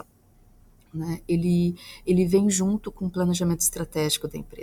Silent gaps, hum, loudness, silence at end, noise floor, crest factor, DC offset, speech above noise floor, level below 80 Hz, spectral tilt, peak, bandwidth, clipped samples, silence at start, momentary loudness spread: none; none; -24 LUFS; 0 s; -57 dBFS; 18 dB; under 0.1%; 32 dB; -48 dBFS; -5 dB/octave; -8 dBFS; 16 kHz; under 0.1%; 0.95 s; 12 LU